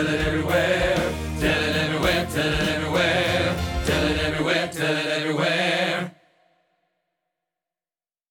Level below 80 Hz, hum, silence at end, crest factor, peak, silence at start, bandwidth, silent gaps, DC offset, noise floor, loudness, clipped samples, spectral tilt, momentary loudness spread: -38 dBFS; none; 2.2 s; 16 dB; -6 dBFS; 0 s; 19 kHz; none; under 0.1%; under -90 dBFS; -22 LUFS; under 0.1%; -4.5 dB/octave; 4 LU